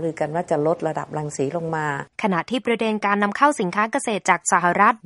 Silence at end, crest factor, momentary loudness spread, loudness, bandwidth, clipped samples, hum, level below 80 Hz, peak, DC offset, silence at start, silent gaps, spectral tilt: 0.1 s; 20 dB; 8 LU; -21 LUFS; 11.5 kHz; under 0.1%; none; -64 dBFS; -2 dBFS; under 0.1%; 0 s; none; -4.5 dB/octave